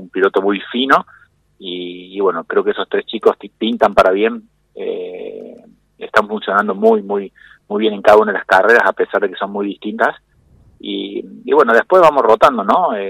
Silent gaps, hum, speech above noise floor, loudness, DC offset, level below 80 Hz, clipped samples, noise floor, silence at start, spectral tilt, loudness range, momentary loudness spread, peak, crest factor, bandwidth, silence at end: none; none; 35 dB; -14 LUFS; under 0.1%; -52 dBFS; 0.4%; -49 dBFS; 0 s; -5.5 dB/octave; 4 LU; 17 LU; 0 dBFS; 16 dB; 15.5 kHz; 0 s